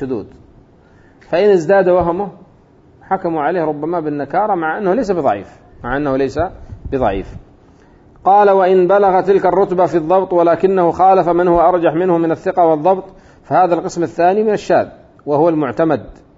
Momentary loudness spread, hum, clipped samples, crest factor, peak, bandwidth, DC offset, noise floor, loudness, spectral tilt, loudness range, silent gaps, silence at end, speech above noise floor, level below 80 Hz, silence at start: 11 LU; none; under 0.1%; 14 dB; -2 dBFS; 7.8 kHz; under 0.1%; -47 dBFS; -14 LUFS; -7.5 dB/octave; 6 LU; none; 0.25 s; 33 dB; -42 dBFS; 0 s